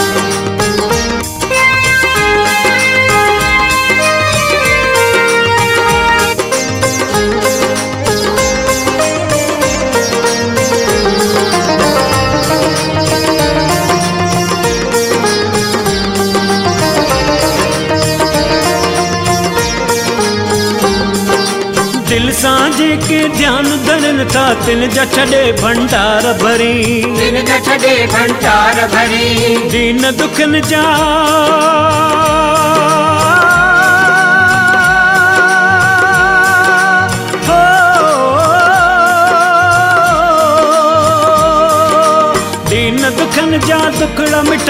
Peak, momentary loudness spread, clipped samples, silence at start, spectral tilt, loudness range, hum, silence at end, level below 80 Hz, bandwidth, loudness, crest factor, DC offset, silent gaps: 0 dBFS; 5 LU; under 0.1%; 0 s; -3.5 dB/octave; 4 LU; none; 0 s; -32 dBFS; 16.5 kHz; -10 LUFS; 10 dB; under 0.1%; none